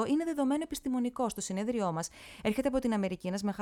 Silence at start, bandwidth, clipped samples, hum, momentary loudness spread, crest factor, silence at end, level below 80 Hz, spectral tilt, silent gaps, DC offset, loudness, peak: 0 s; 17 kHz; under 0.1%; none; 4 LU; 16 dB; 0 s; -58 dBFS; -5.5 dB/octave; none; under 0.1%; -33 LUFS; -16 dBFS